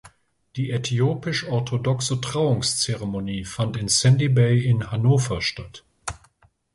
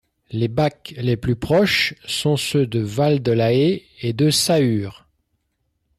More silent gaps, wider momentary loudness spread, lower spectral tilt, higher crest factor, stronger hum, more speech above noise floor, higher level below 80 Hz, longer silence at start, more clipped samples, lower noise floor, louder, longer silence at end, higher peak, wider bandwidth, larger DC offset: neither; first, 17 LU vs 9 LU; about the same, -5 dB/octave vs -5 dB/octave; about the same, 16 dB vs 14 dB; neither; second, 38 dB vs 52 dB; about the same, -48 dBFS vs -50 dBFS; second, 0.05 s vs 0.3 s; neither; second, -60 dBFS vs -71 dBFS; second, -22 LUFS vs -19 LUFS; second, 0.6 s vs 1.05 s; about the same, -6 dBFS vs -6 dBFS; second, 11.5 kHz vs 14.5 kHz; neither